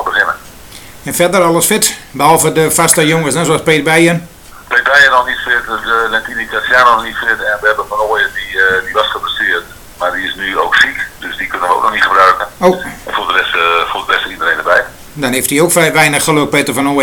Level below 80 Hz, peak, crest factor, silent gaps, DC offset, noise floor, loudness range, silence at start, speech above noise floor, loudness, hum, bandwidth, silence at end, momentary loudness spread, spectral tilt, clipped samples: -42 dBFS; 0 dBFS; 12 dB; none; under 0.1%; -33 dBFS; 4 LU; 0 s; 21 dB; -11 LUFS; none; 19.5 kHz; 0 s; 9 LU; -3 dB/octave; 0.3%